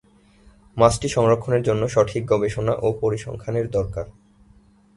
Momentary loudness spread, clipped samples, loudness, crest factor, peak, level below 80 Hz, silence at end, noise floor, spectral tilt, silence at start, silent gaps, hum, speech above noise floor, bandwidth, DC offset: 11 LU; under 0.1%; -21 LUFS; 20 dB; -2 dBFS; -44 dBFS; 0.85 s; -54 dBFS; -6 dB/octave; 0.75 s; none; none; 33 dB; 11.5 kHz; under 0.1%